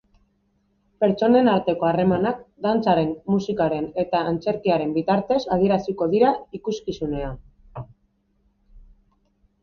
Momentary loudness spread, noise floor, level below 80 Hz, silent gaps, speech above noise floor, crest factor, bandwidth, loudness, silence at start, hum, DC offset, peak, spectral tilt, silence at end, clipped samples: 11 LU; -67 dBFS; -48 dBFS; none; 46 dB; 18 dB; 7 kHz; -22 LUFS; 1 s; none; under 0.1%; -6 dBFS; -7.5 dB/octave; 0.85 s; under 0.1%